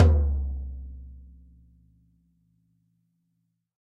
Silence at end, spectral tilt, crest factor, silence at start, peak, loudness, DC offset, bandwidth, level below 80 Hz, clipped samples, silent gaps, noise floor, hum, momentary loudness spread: 2.65 s; -9 dB/octave; 24 dB; 0 s; -4 dBFS; -28 LUFS; under 0.1%; 3.9 kHz; -32 dBFS; under 0.1%; none; -76 dBFS; none; 25 LU